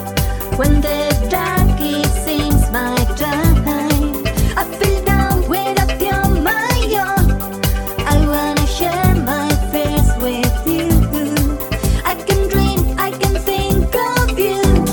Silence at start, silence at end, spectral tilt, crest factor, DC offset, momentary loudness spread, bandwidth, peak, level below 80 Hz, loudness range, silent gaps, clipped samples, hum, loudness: 0 s; 0 s; -5.5 dB/octave; 14 dB; under 0.1%; 3 LU; 19.5 kHz; 0 dBFS; -20 dBFS; 1 LU; none; under 0.1%; none; -16 LUFS